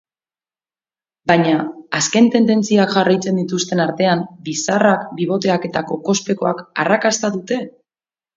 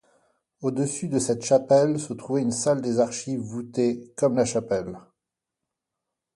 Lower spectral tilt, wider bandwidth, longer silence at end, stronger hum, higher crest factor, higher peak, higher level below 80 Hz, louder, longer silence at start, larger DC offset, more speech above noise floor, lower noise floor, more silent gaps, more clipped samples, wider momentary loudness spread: about the same, -4.5 dB/octave vs -5.5 dB/octave; second, 7.8 kHz vs 11.5 kHz; second, 0.65 s vs 1.35 s; neither; about the same, 18 dB vs 18 dB; first, 0 dBFS vs -8 dBFS; about the same, -62 dBFS vs -62 dBFS; first, -17 LUFS vs -25 LUFS; first, 1.25 s vs 0.6 s; neither; first, over 74 dB vs 62 dB; first, under -90 dBFS vs -86 dBFS; neither; neither; about the same, 9 LU vs 11 LU